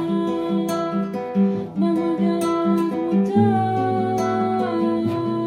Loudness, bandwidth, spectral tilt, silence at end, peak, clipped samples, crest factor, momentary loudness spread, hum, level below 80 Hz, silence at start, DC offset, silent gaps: -21 LUFS; 15.5 kHz; -7.5 dB/octave; 0 s; -6 dBFS; under 0.1%; 14 dB; 4 LU; none; -62 dBFS; 0 s; under 0.1%; none